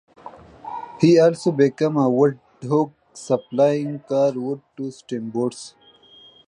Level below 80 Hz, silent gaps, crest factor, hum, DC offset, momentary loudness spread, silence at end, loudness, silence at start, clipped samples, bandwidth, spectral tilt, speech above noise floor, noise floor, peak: -66 dBFS; none; 18 dB; none; under 0.1%; 18 LU; 0.8 s; -20 LUFS; 0.25 s; under 0.1%; 11 kHz; -7 dB/octave; 30 dB; -50 dBFS; -4 dBFS